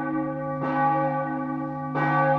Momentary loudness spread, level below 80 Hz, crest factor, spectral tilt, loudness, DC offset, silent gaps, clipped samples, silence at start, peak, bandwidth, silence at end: 7 LU; -60 dBFS; 14 dB; -9.5 dB/octave; -26 LUFS; under 0.1%; none; under 0.1%; 0 s; -10 dBFS; 5.8 kHz; 0 s